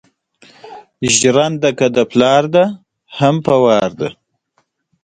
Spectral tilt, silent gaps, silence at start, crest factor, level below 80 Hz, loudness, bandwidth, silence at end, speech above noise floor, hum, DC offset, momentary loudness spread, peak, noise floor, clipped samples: -4 dB/octave; none; 0.65 s; 16 dB; -54 dBFS; -13 LUFS; 9.6 kHz; 0.9 s; 51 dB; none; under 0.1%; 12 LU; 0 dBFS; -64 dBFS; under 0.1%